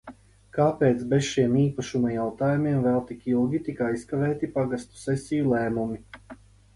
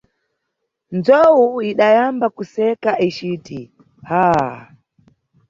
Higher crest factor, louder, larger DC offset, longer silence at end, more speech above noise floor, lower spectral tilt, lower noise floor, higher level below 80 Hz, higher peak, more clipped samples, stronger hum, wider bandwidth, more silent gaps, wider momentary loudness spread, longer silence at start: about the same, 18 dB vs 16 dB; second, -26 LUFS vs -16 LUFS; neither; second, 0.4 s vs 0.85 s; second, 24 dB vs 60 dB; about the same, -7 dB/octave vs -7 dB/octave; second, -49 dBFS vs -76 dBFS; about the same, -54 dBFS vs -56 dBFS; second, -8 dBFS vs -2 dBFS; neither; neither; first, 11.5 kHz vs 7.4 kHz; neither; second, 8 LU vs 15 LU; second, 0.05 s vs 0.9 s